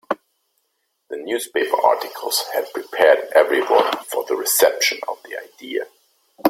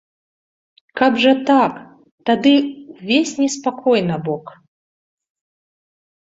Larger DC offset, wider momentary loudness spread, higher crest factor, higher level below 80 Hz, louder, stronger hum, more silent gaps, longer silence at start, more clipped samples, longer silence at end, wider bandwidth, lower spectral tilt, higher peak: neither; about the same, 15 LU vs 14 LU; about the same, 20 dB vs 18 dB; second, -70 dBFS vs -64 dBFS; about the same, -19 LUFS vs -17 LUFS; neither; second, none vs 2.11-2.18 s; second, 0.1 s vs 0.95 s; neither; second, 0 s vs 1.9 s; first, 16.5 kHz vs 7.8 kHz; second, -1 dB/octave vs -4.5 dB/octave; about the same, 0 dBFS vs -2 dBFS